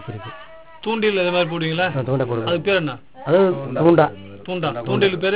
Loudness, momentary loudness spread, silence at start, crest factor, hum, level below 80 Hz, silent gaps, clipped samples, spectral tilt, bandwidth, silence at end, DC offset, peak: -19 LUFS; 16 LU; 0 s; 18 dB; none; -54 dBFS; none; under 0.1%; -10.5 dB/octave; 4 kHz; 0 s; 0.5%; 0 dBFS